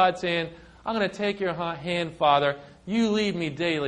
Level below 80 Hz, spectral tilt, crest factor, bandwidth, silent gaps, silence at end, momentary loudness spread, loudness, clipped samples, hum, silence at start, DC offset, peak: -58 dBFS; -5.5 dB/octave; 18 dB; 10 kHz; none; 0 s; 9 LU; -26 LUFS; under 0.1%; none; 0 s; under 0.1%; -8 dBFS